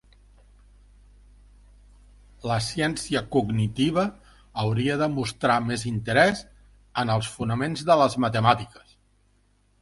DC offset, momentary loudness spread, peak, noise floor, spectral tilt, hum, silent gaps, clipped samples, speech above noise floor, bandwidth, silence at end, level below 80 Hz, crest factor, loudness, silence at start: under 0.1%; 9 LU; -4 dBFS; -64 dBFS; -5.5 dB/octave; 50 Hz at -50 dBFS; none; under 0.1%; 40 dB; 11.5 kHz; 1.15 s; -52 dBFS; 22 dB; -24 LUFS; 2.45 s